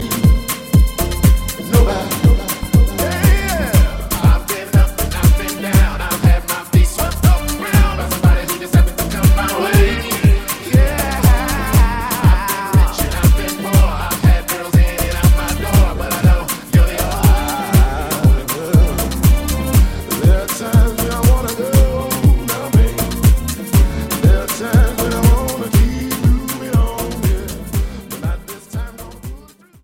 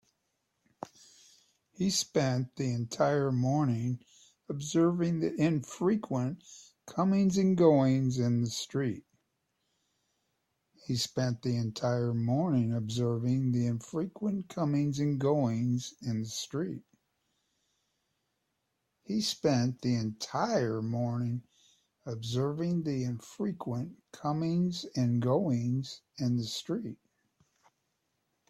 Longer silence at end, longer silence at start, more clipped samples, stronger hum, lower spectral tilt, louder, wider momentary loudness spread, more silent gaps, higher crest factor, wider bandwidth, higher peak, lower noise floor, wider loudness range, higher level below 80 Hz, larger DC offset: second, 0.45 s vs 1.55 s; second, 0 s vs 1.8 s; neither; neither; about the same, -5.5 dB/octave vs -6.5 dB/octave; first, -15 LUFS vs -31 LUFS; second, 4 LU vs 11 LU; neither; second, 14 dB vs 20 dB; first, 17 kHz vs 14 kHz; first, 0 dBFS vs -12 dBFS; second, -39 dBFS vs -81 dBFS; second, 1 LU vs 7 LU; first, -16 dBFS vs -68 dBFS; first, 0.1% vs under 0.1%